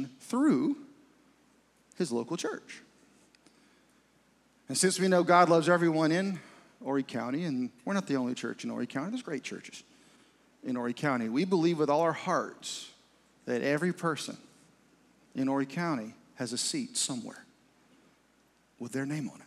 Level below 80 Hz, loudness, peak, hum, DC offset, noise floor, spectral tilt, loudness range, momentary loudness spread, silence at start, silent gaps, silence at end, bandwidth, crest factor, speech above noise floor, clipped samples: -82 dBFS; -30 LUFS; -8 dBFS; none; under 0.1%; -67 dBFS; -4.5 dB/octave; 9 LU; 17 LU; 0 s; none; 0.05 s; 14.5 kHz; 24 dB; 37 dB; under 0.1%